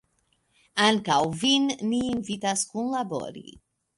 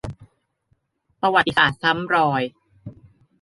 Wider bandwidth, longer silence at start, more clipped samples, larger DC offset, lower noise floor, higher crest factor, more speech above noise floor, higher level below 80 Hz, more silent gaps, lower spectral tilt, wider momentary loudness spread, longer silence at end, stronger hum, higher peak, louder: about the same, 11.5 kHz vs 11.5 kHz; first, 0.75 s vs 0.05 s; neither; neither; about the same, -70 dBFS vs -68 dBFS; about the same, 20 dB vs 22 dB; about the same, 45 dB vs 48 dB; second, -62 dBFS vs -52 dBFS; neither; second, -3 dB/octave vs -5.5 dB/octave; about the same, 10 LU vs 10 LU; about the same, 0.55 s vs 0.5 s; neither; second, -6 dBFS vs -2 dBFS; second, -25 LUFS vs -19 LUFS